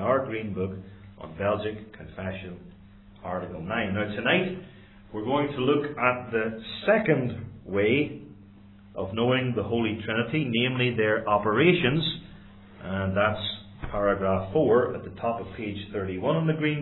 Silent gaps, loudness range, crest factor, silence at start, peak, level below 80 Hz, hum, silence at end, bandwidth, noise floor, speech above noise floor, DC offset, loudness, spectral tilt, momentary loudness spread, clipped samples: none; 6 LU; 20 dB; 0 s; -6 dBFS; -54 dBFS; none; 0 s; 4.2 kHz; -50 dBFS; 24 dB; under 0.1%; -26 LUFS; -10 dB/octave; 16 LU; under 0.1%